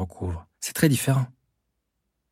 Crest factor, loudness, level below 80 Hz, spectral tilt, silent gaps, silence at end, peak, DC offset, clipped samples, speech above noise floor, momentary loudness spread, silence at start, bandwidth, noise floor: 22 dB; -25 LUFS; -50 dBFS; -5.5 dB/octave; none; 1.05 s; -6 dBFS; under 0.1%; under 0.1%; 54 dB; 12 LU; 0 s; 16.5 kHz; -78 dBFS